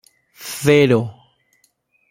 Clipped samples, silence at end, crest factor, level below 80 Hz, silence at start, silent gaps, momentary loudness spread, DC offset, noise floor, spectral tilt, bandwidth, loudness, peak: under 0.1%; 1 s; 18 dB; -56 dBFS; 0.4 s; none; 18 LU; under 0.1%; -63 dBFS; -5.5 dB/octave; 16.5 kHz; -16 LUFS; -2 dBFS